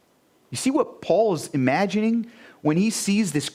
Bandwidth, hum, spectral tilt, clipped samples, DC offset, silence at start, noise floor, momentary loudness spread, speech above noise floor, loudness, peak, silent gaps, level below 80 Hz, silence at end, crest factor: 16 kHz; none; -5 dB/octave; under 0.1%; under 0.1%; 0.5 s; -61 dBFS; 7 LU; 39 dB; -23 LUFS; -6 dBFS; none; -66 dBFS; 0.05 s; 16 dB